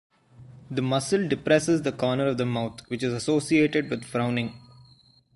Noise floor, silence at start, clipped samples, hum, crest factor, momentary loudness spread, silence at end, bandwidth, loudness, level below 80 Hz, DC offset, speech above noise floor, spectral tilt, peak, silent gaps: -58 dBFS; 0.4 s; under 0.1%; none; 20 dB; 9 LU; 0.75 s; 11.5 kHz; -25 LUFS; -60 dBFS; under 0.1%; 33 dB; -5.5 dB/octave; -6 dBFS; none